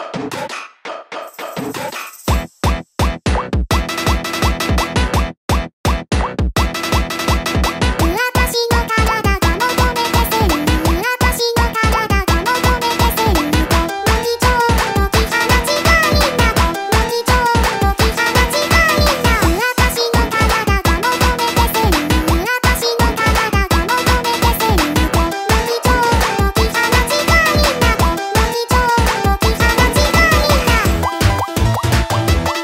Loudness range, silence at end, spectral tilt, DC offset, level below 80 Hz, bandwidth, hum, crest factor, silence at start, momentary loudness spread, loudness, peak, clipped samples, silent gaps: 4 LU; 0 s; -4.5 dB/octave; under 0.1%; -20 dBFS; 16.5 kHz; none; 14 dB; 0 s; 7 LU; -15 LUFS; 0 dBFS; under 0.1%; 5.37-5.48 s, 5.73-5.84 s